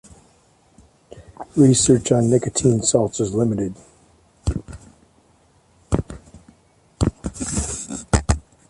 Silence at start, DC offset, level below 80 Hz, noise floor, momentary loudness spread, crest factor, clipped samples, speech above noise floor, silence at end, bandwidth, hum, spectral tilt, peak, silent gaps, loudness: 1.1 s; under 0.1%; -34 dBFS; -57 dBFS; 14 LU; 20 dB; under 0.1%; 39 dB; 0.3 s; 11.5 kHz; none; -5.5 dB/octave; 0 dBFS; none; -20 LUFS